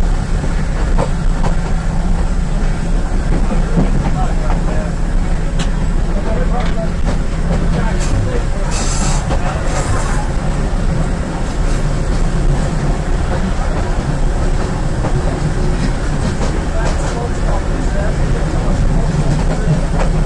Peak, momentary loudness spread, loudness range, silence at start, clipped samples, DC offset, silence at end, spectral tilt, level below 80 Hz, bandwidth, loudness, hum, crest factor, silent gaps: -4 dBFS; 3 LU; 1 LU; 0 s; under 0.1%; under 0.1%; 0 s; -6 dB/octave; -16 dBFS; 11 kHz; -18 LUFS; none; 10 dB; none